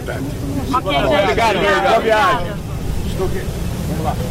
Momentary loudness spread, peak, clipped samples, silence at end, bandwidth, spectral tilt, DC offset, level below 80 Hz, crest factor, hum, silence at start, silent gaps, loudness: 10 LU; -6 dBFS; under 0.1%; 0 s; 16 kHz; -5.5 dB/octave; under 0.1%; -28 dBFS; 12 dB; none; 0 s; none; -17 LUFS